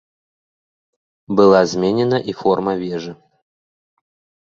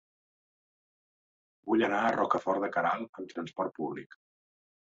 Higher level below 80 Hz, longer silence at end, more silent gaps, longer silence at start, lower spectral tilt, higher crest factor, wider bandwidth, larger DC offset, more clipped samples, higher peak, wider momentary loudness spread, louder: first, -56 dBFS vs -76 dBFS; first, 1.35 s vs 0.9 s; second, none vs 3.09-3.13 s; second, 1.3 s vs 1.65 s; first, -6.5 dB/octave vs -3.5 dB/octave; about the same, 18 dB vs 22 dB; about the same, 7.6 kHz vs 7.6 kHz; neither; neither; first, -2 dBFS vs -12 dBFS; about the same, 14 LU vs 12 LU; first, -16 LUFS vs -31 LUFS